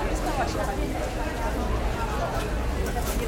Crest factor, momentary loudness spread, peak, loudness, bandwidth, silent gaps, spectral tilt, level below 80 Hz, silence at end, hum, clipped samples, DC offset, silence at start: 12 dB; 2 LU; -14 dBFS; -28 LUFS; 17 kHz; none; -5.5 dB/octave; -30 dBFS; 0 s; none; under 0.1%; under 0.1%; 0 s